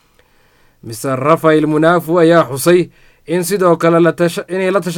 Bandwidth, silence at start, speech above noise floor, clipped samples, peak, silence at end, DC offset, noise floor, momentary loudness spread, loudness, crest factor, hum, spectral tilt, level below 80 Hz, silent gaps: 18.5 kHz; 0.85 s; 39 dB; under 0.1%; 0 dBFS; 0 s; under 0.1%; -52 dBFS; 10 LU; -13 LUFS; 14 dB; none; -6 dB/octave; -54 dBFS; none